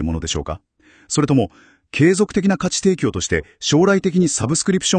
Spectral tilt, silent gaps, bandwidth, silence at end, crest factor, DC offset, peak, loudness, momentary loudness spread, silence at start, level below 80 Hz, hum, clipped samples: -4.5 dB/octave; none; 9.8 kHz; 0 s; 16 dB; under 0.1%; -2 dBFS; -18 LUFS; 10 LU; 0 s; -42 dBFS; none; under 0.1%